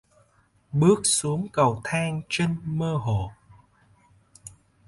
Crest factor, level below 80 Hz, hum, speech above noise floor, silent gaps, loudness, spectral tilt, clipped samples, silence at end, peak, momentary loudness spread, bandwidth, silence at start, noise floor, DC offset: 20 dB; -52 dBFS; none; 39 dB; none; -24 LUFS; -5 dB/octave; under 0.1%; 0.4 s; -6 dBFS; 24 LU; 11.5 kHz; 0.75 s; -63 dBFS; under 0.1%